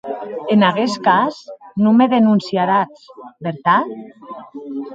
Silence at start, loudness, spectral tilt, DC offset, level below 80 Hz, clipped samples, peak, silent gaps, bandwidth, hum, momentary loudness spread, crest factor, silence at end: 0.05 s; -16 LUFS; -6.5 dB/octave; under 0.1%; -64 dBFS; under 0.1%; 0 dBFS; none; 7.8 kHz; none; 20 LU; 16 dB; 0 s